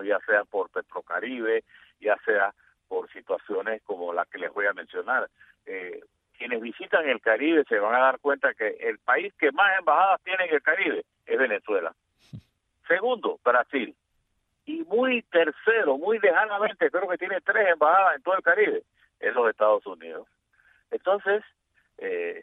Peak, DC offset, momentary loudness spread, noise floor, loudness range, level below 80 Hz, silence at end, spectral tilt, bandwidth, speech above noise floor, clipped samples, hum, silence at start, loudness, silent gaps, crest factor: -8 dBFS; under 0.1%; 13 LU; -74 dBFS; 6 LU; -76 dBFS; 0 s; -6.5 dB/octave; 4 kHz; 49 dB; under 0.1%; none; 0 s; -25 LUFS; none; 18 dB